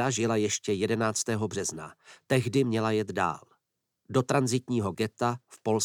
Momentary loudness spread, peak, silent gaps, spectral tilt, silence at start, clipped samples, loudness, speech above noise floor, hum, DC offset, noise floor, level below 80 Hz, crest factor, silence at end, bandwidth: 7 LU; -10 dBFS; none; -5 dB/octave; 0 s; under 0.1%; -28 LUFS; 52 dB; none; under 0.1%; -80 dBFS; -68 dBFS; 18 dB; 0 s; 17 kHz